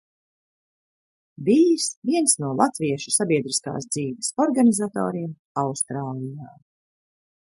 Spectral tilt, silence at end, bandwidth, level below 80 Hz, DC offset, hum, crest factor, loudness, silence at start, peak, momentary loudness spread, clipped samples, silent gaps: -4.5 dB/octave; 1.1 s; 11.5 kHz; -68 dBFS; under 0.1%; none; 20 dB; -22 LUFS; 1.4 s; -4 dBFS; 12 LU; under 0.1%; 1.97-2.02 s, 5.39-5.55 s